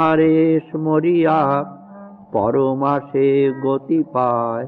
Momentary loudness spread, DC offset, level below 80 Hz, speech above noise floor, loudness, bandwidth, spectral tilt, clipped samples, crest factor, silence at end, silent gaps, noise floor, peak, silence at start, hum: 7 LU; under 0.1%; -60 dBFS; 22 dB; -17 LUFS; 4.5 kHz; -10.5 dB/octave; under 0.1%; 12 dB; 0 s; none; -39 dBFS; -4 dBFS; 0 s; none